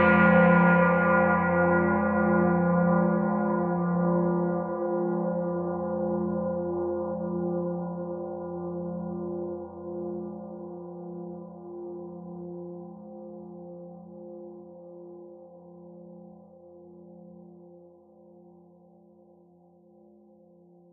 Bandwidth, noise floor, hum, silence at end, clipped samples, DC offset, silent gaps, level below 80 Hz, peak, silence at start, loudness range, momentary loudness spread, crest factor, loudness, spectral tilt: 3.5 kHz; -58 dBFS; none; 3.15 s; under 0.1%; under 0.1%; none; -60 dBFS; -8 dBFS; 0 s; 23 LU; 23 LU; 20 dB; -26 LUFS; -8 dB/octave